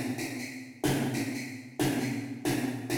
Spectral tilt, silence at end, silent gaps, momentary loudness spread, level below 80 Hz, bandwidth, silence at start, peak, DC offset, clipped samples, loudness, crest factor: -5 dB/octave; 0 s; none; 8 LU; -60 dBFS; over 20 kHz; 0 s; -14 dBFS; under 0.1%; under 0.1%; -32 LUFS; 18 dB